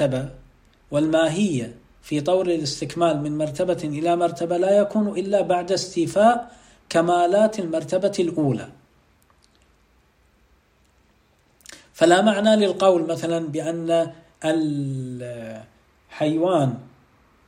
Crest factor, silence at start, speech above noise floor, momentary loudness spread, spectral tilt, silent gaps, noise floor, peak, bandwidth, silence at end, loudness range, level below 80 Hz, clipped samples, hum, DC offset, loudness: 18 dB; 0 s; 40 dB; 12 LU; -5.5 dB/octave; none; -60 dBFS; -4 dBFS; 15 kHz; 0.6 s; 6 LU; -58 dBFS; under 0.1%; none; under 0.1%; -21 LUFS